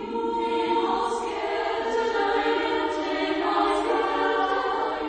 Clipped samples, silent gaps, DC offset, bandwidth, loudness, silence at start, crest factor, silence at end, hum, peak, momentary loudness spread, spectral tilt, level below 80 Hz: under 0.1%; none; under 0.1%; 9.4 kHz; -25 LUFS; 0 s; 14 dB; 0 s; none; -10 dBFS; 4 LU; -3.5 dB/octave; -54 dBFS